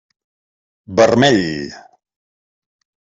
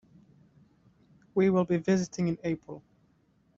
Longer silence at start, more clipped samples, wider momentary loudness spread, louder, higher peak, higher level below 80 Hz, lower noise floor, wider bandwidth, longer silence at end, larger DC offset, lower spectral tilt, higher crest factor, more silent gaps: second, 0.9 s vs 1.35 s; neither; about the same, 16 LU vs 15 LU; first, -14 LUFS vs -29 LUFS; first, -2 dBFS vs -14 dBFS; first, -54 dBFS vs -66 dBFS; first, under -90 dBFS vs -67 dBFS; about the same, 7.8 kHz vs 7.6 kHz; first, 1.4 s vs 0.8 s; neither; second, -5 dB/octave vs -7 dB/octave; about the same, 18 dB vs 18 dB; neither